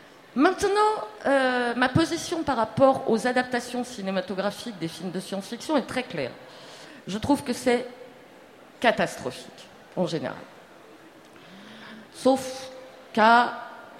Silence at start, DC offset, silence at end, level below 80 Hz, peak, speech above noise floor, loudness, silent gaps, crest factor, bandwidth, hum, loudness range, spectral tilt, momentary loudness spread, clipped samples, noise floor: 0.35 s; under 0.1%; 0 s; -60 dBFS; -4 dBFS; 25 dB; -25 LUFS; none; 22 dB; 16 kHz; none; 8 LU; -4.5 dB/octave; 22 LU; under 0.1%; -50 dBFS